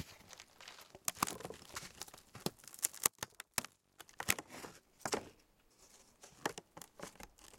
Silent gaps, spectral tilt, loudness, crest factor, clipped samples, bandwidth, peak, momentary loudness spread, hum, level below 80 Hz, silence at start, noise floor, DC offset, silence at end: none; -1.5 dB/octave; -41 LUFS; 36 dB; under 0.1%; 17 kHz; -8 dBFS; 21 LU; none; -72 dBFS; 0 s; -69 dBFS; under 0.1%; 0 s